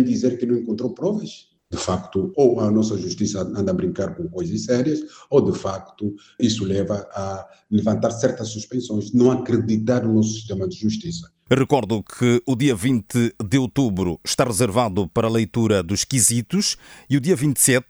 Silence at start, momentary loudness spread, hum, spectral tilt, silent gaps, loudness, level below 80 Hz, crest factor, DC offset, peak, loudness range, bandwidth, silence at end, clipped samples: 0 s; 10 LU; none; -5 dB/octave; none; -21 LUFS; -52 dBFS; 20 dB; under 0.1%; -2 dBFS; 3 LU; over 20 kHz; 0.1 s; under 0.1%